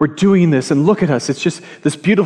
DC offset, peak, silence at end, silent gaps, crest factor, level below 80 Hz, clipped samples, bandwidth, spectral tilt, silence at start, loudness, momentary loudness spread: under 0.1%; -2 dBFS; 0 s; none; 12 dB; -54 dBFS; under 0.1%; 11 kHz; -6.5 dB/octave; 0 s; -15 LUFS; 8 LU